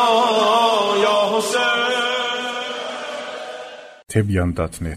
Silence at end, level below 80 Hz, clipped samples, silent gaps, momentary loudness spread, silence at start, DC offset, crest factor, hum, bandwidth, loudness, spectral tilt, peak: 0 s; -44 dBFS; under 0.1%; none; 15 LU; 0 s; under 0.1%; 16 dB; none; 15.5 kHz; -19 LUFS; -4 dB/octave; -4 dBFS